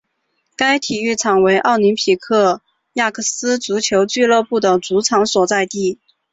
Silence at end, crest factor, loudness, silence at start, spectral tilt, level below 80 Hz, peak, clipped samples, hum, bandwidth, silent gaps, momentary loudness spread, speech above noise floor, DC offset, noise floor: 0.4 s; 14 dB; -16 LUFS; 0.6 s; -3 dB/octave; -58 dBFS; -2 dBFS; under 0.1%; none; 8 kHz; none; 6 LU; 54 dB; under 0.1%; -69 dBFS